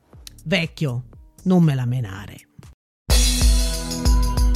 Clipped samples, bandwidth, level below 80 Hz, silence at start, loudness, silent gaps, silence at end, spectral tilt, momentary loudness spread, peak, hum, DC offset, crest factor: under 0.1%; 15.5 kHz; -22 dBFS; 0.15 s; -21 LUFS; 2.74-3.06 s; 0 s; -4.5 dB/octave; 17 LU; -6 dBFS; none; under 0.1%; 14 dB